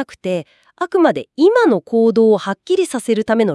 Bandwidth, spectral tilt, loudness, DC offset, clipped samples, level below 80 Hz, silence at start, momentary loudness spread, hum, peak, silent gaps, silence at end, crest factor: 12 kHz; -5.5 dB/octave; -16 LUFS; under 0.1%; under 0.1%; -64 dBFS; 0 s; 10 LU; none; -2 dBFS; none; 0 s; 14 dB